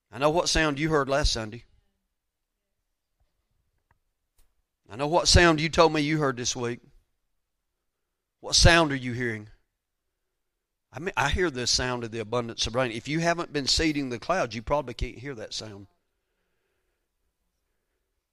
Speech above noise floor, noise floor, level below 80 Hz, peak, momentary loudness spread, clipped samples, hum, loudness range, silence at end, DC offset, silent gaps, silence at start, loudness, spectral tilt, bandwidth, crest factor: 57 dB; -82 dBFS; -38 dBFS; -4 dBFS; 17 LU; under 0.1%; none; 10 LU; 2.5 s; under 0.1%; none; 0.15 s; -24 LUFS; -3.5 dB/octave; 14.5 kHz; 24 dB